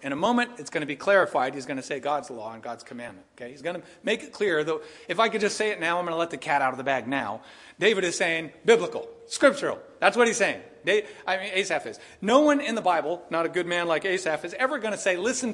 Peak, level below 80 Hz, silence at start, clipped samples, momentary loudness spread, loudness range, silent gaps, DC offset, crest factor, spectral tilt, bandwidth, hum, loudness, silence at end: -4 dBFS; -70 dBFS; 0 s; under 0.1%; 13 LU; 5 LU; none; under 0.1%; 22 dB; -3.5 dB/octave; 11.5 kHz; none; -25 LUFS; 0 s